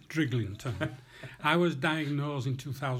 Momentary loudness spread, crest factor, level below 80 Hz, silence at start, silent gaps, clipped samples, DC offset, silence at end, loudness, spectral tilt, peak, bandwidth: 10 LU; 20 dB; -64 dBFS; 0.1 s; none; under 0.1%; under 0.1%; 0 s; -31 LUFS; -6 dB/octave; -12 dBFS; 16 kHz